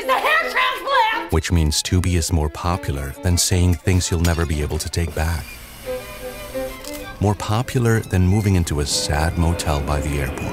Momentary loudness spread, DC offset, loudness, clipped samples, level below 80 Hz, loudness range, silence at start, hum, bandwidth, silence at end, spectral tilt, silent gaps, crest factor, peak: 12 LU; under 0.1%; -20 LUFS; under 0.1%; -30 dBFS; 5 LU; 0 s; none; 16 kHz; 0 s; -4.5 dB/octave; none; 16 dB; -4 dBFS